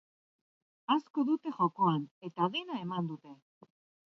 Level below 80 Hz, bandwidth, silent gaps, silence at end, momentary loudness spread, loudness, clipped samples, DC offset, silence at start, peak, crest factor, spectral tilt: -82 dBFS; 6.4 kHz; 1.10-1.14 s, 2.11-2.21 s; 0.7 s; 12 LU; -33 LUFS; under 0.1%; under 0.1%; 0.9 s; -14 dBFS; 20 dB; -8 dB/octave